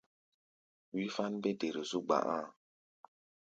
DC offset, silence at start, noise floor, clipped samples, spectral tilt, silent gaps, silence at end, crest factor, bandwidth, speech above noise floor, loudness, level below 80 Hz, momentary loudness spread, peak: under 0.1%; 0.95 s; under -90 dBFS; under 0.1%; -5 dB/octave; none; 1 s; 22 dB; 9 kHz; over 54 dB; -37 LUFS; -84 dBFS; 8 LU; -16 dBFS